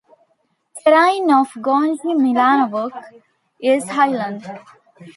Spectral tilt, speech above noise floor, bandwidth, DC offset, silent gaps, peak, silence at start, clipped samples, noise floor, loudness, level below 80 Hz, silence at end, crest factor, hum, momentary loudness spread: -4.5 dB/octave; 49 dB; 11.5 kHz; under 0.1%; none; -2 dBFS; 0.75 s; under 0.1%; -65 dBFS; -17 LUFS; -74 dBFS; 0.05 s; 16 dB; none; 16 LU